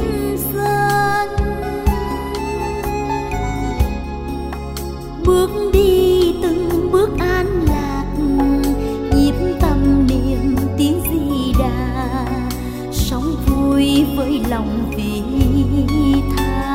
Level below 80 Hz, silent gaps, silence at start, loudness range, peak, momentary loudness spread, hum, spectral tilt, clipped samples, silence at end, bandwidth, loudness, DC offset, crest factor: -24 dBFS; none; 0 s; 5 LU; 0 dBFS; 8 LU; none; -6.5 dB/octave; under 0.1%; 0 s; 16.5 kHz; -18 LUFS; 0.5%; 16 dB